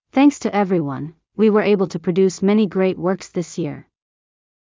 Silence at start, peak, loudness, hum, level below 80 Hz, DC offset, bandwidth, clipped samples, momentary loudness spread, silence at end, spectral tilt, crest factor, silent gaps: 0.15 s; -4 dBFS; -19 LUFS; none; -60 dBFS; under 0.1%; 7.6 kHz; under 0.1%; 12 LU; 1 s; -6.5 dB/octave; 14 dB; none